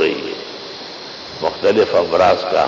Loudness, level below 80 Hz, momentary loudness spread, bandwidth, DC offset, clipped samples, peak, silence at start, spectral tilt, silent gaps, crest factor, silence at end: -16 LUFS; -50 dBFS; 16 LU; 7.6 kHz; under 0.1%; under 0.1%; -4 dBFS; 0 s; -4.5 dB/octave; none; 14 dB; 0 s